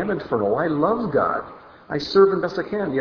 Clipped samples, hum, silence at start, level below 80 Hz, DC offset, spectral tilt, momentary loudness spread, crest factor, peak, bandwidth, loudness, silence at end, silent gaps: under 0.1%; none; 0 s; -54 dBFS; under 0.1%; -7 dB/octave; 12 LU; 18 dB; -4 dBFS; 5.4 kHz; -21 LUFS; 0 s; none